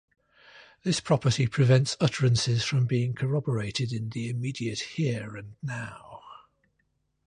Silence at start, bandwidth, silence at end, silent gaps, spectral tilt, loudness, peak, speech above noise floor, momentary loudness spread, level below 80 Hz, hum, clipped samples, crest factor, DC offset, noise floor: 0.55 s; 10.5 kHz; 0.95 s; none; -5.5 dB/octave; -27 LUFS; -10 dBFS; 48 dB; 15 LU; -58 dBFS; none; under 0.1%; 18 dB; under 0.1%; -74 dBFS